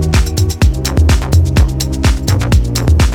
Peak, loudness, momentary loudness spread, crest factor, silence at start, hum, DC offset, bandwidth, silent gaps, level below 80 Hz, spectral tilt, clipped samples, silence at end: 0 dBFS; -13 LUFS; 3 LU; 10 dB; 0 s; none; under 0.1%; 17.5 kHz; none; -14 dBFS; -5.5 dB/octave; under 0.1%; 0 s